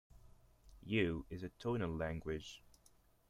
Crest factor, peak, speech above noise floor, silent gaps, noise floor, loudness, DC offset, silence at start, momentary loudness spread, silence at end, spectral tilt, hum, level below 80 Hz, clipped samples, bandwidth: 24 dB; -20 dBFS; 29 dB; none; -70 dBFS; -41 LUFS; under 0.1%; 0.15 s; 17 LU; 0.6 s; -6.5 dB/octave; none; -60 dBFS; under 0.1%; 15.5 kHz